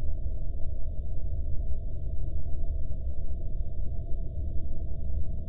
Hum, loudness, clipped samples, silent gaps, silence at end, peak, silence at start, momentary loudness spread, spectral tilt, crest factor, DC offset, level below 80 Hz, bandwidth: none; -37 LUFS; under 0.1%; none; 0 s; -14 dBFS; 0 s; 2 LU; -13 dB/octave; 10 dB; under 0.1%; -32 dBFS; 0.7 kHz